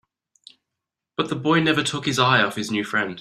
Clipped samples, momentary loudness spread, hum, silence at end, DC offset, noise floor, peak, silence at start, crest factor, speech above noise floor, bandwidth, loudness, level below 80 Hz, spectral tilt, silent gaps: under 0.1%; 9 LU; none; 0 s; under 0.1%; -84 dBFS; -2 dBFS; 1.2 s; 20 dB; 63 dB; 14 kHz; -21 LUFS; -60 dBFS; -4.5 dB/octave; none